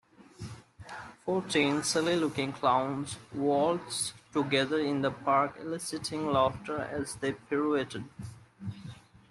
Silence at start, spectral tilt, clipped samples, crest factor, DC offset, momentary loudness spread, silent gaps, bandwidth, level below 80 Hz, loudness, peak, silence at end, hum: 0.2 s; -4.5 dB/octave; under 0.1%; 18 dB; under 0.1%; 18 LU; none; 12.5 kHz; -64 dBFS; -30 LUFS; -12 dBFS; 0.35 s; none